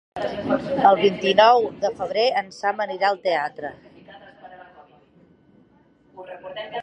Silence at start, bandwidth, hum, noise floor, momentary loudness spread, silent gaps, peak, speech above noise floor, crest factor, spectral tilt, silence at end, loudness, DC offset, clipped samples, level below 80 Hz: 0.15 s; 8.8 kHz; none; -57 dBFS; 19 LU; none; -2 dBFS; 37 dB; 22 dB; -5 dB/octave; 0 s; -20 LUFS; under 0.1%; under 0.1%; -62 dBFS